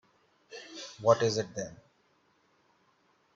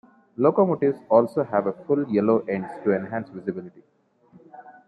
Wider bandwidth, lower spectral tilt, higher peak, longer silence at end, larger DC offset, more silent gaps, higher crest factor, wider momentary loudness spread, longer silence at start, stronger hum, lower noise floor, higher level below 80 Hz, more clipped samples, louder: second, 7.6 kHz vs 9.6 kHz; second, -4.5 dB/octave vs -10 dB/octave; second, -8 dBFS vs -4 dBFS; first, 1.6 s vs 0.15 s; neither; neither; first, 26 dB vs 20 dB; first, 21 LU vs 12 LU; about the same, 0.5 s vs 0.4 s; neither; first, -70 dBFS vs -56 dBFS; about the same, -72 dBFS vs -72 dBFS; neither; second, -30 LUFS vs -23 LUFS